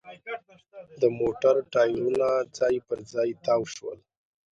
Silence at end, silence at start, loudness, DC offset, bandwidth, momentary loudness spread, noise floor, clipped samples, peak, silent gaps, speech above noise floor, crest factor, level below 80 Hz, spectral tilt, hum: 0.55 s; 0.05 s; -26 LUFS; under 0.1%; 8.8 kHz; 15 LU; -49 dBFS; under 0.1%; -10 dBFS; none; 24 dB; 18 dB; -64 dBFS; -5.5 dB/octave; none